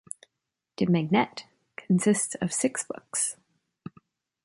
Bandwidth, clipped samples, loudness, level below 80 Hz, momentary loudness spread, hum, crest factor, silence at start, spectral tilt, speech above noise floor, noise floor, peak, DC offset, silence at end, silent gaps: 11.5 kHz; under 0.1%; -27 LUFS; -68 dBFS; 23 LU; none; 18 dB; 0.8 s; -5 dB/octave; 59 dB; -85 dBFS; -10 dBFS; under 0.1%; 1.1 s; none